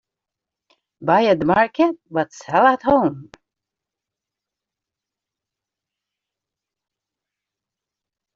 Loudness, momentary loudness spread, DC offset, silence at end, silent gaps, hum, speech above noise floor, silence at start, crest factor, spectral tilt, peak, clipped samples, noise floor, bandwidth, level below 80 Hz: -18 LUFS; 9 LU; under 0.1%; 5.15 s; none; none; 69 dB; 1 s; 20 dB; -4.5 dB/octave; -2 dBFS; under 0.1%; -87 dBFS; 7.6 kHz; -56 dBFS